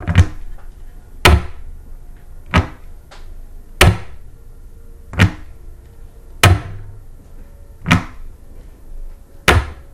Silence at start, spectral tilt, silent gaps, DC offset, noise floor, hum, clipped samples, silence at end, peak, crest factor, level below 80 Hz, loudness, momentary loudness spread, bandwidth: 0 s; -4.5 dB/octave; none; under 0.1%; -37 dBFS; none; 0.1%; 0.05 s; 0 dBFS; 18 dB; -26 dBFS; -15 LUFS; 24 LU; 15.5 kHz